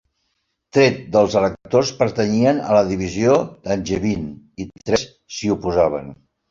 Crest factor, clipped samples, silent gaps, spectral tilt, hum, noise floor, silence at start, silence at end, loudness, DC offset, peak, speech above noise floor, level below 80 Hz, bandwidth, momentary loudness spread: 18 dB; under 0.1%; none; -5.5 dB/octave; none; -72 dBFS; 0.75 s; 0.35 s; -19 LUFS; under 0.1%; -2 dBFS; 54 dB; -46 dBFS; 7.6 kHz; 14 LU